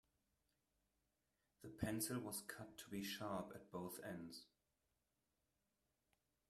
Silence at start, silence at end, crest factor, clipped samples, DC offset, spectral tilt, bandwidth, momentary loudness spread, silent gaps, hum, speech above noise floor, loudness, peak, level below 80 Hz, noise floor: 1.6 s; 2.05 s; 24 dB; under 0.1%; under 0.1%; -4 dB/octave; 15.5 kHz; 13 LU; none; none; 40 dB; -49 LUFS; -28 dBFS; -76 dBFS; -89 dBFS